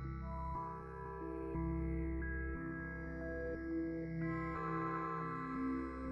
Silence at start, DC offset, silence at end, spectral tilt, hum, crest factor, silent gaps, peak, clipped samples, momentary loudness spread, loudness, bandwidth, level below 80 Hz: 0 s; under 0.1%; 0 s; -10 dB/octave; none; 12 dB; none; -28 dBFS; under 0.1%; 5 LU; -42 LUFS; 5.8 kHz; -48 dBFS